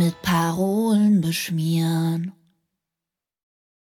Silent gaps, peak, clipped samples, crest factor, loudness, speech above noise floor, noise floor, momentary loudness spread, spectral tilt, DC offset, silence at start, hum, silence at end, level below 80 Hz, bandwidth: none; -10 dBFS; under 0.1%; 14 dB; -21 LUFS; 67 dB; -88 dBFS; 7 LU; -6 dB/octave; under 0.1%; 0 s; none; 1.65 s; -58 dBFS; 18.5 kHz